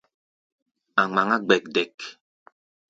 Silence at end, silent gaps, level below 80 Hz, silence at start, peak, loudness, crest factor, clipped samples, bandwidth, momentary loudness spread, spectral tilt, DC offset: 0.75 s; 1.94-1.98 s; -72 dBFS; 0.95 s; -4 dBFS; -23 LUFS; 24 dB; under 0.1%; 7.8 kHz; 15 LU; -4.5 dB/octave; under 0.1%